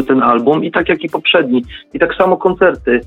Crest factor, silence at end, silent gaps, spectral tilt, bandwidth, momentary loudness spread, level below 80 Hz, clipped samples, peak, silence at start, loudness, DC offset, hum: 12 dB; 0 s; none; -7 dB/octave; 4.3 kHz; 6 LU; -42 dBFS; under 0.1%; 0 dBFS; 0 s; -13 LUFS; under 0.1%; none